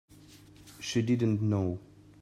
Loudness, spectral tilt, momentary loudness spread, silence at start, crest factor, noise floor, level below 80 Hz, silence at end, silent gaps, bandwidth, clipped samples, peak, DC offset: -30 LUFS; -6.5 dB/octave; 12 LU; 0.3 s; 14 dB; -54 dBFS; -64 dBFS; 0.35 s; none; 13.5 kHz; under 0.1%; -16 dBFS; under 0.1%